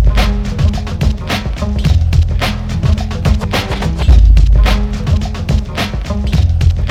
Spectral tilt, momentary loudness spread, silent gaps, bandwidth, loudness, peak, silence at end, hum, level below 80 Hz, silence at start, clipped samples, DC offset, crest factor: -6.5 dB/octave; 8 LU; none; 13 kHz; -14 LUFS; 0 dBFS; 0 s; none; -14 dBFS; 0 s; 0.2%; under 0.1%; 12 dB